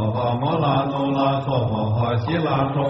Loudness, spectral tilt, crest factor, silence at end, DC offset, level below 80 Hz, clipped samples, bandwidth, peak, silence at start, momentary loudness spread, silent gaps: -21 LUFS; -6.5 dB/octave; 14 dB; 0 s; under 0.1%; -48 dBFS; under 0.1%; 6 kHz; -8 dBFS; 0 s; 2 LU; none